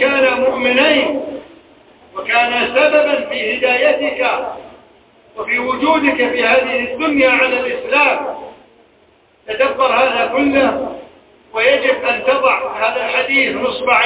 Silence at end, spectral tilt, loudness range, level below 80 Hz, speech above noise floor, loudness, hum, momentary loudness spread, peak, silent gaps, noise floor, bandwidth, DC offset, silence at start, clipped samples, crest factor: 0 s; -7 dB/octave; 2 LU; -52 dBFS; 37 dB; -14 LUFS; none; 14 LU; 0 dBFS; none; -52 dBFS; 4 kHz; under 0.1%; 0 s; under 0.1%; 16 dB